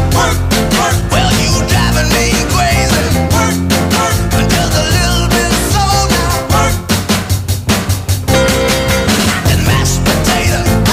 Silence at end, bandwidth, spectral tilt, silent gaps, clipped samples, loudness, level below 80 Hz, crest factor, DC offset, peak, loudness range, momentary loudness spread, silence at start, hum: 0 s; 16 kHz; -4 dB/octave; none; under 0.1%; -11 LUFS; -20 dBFS; 10 dB; under 0.1%; 0 dBFS; 1 LU; 3 LU; 0 s; none